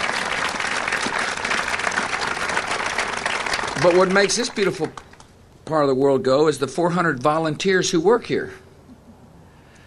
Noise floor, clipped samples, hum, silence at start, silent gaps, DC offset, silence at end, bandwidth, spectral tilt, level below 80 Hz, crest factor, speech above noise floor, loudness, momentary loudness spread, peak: -48 dBFS; under 0.1%; none; 0 s; none; under 0.1%; 0.75 s; 13 kHz; -4 dB/octave; -52 dBFS; 16 dB; 29 dB; -20 LUFS; 6 LU; -4 dBFS